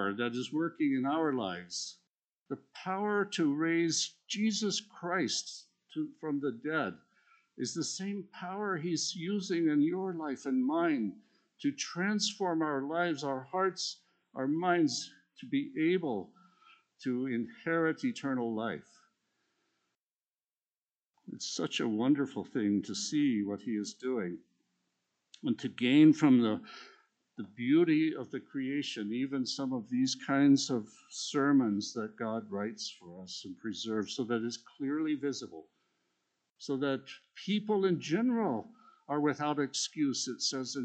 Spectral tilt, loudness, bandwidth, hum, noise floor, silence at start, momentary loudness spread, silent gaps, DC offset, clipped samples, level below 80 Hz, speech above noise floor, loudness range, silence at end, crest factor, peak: -4.5 dB/octave; -33 LUFS; 9 kHz; none; under -90 dBFS; 0 s; 13 LU; 2.09-2.14 s, 2.41-2.46 s, 20.00-20.16 s, 20.27-20.31 s, 20.45-20.49 s, 20.82-20.87 s, 20.96-21.11 s; under 0.1%; under 0.1%; -84 dBFS; over 58 dB; 7 LU; 0 s; 20 dB; -14 dBFS